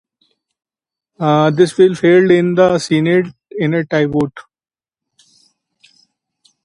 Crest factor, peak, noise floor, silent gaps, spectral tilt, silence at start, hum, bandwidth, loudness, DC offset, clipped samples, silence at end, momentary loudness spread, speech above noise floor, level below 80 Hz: 16 dB; 0 dBFS; -64 dBFS; none; -6.5 dB/octave; 1.2 s; none; 11 kHz; -14 LUFS; under 0.1%; under 0.1%; 2.25 s; 10 LU; 51 dB; -54 dBFS